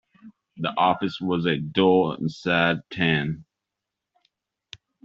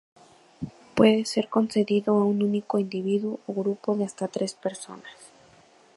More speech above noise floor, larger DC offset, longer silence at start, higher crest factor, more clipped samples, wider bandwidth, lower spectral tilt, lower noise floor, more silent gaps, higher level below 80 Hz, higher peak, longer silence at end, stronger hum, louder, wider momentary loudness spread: first, 62 dB vs 31 dB; neither; second, 0.25 s vs 0.6 s; about the same, 22 dB vs 22 dB; neither; second, 7.6 kHz vs 11.5 kHz; second, -4 dB/octave vs -6 dB/octave; first, -85 dBFS vs -56 dBFS; neither; about the same, -60 dBFS vs -64 dBFS; about the same, -4 dBFS vs -4 dBFS; first, 1.6 s vs 0.7 s; neither; about the same, -23 LUFS vs -25 LUFS; second, 9 LU vs 19 LU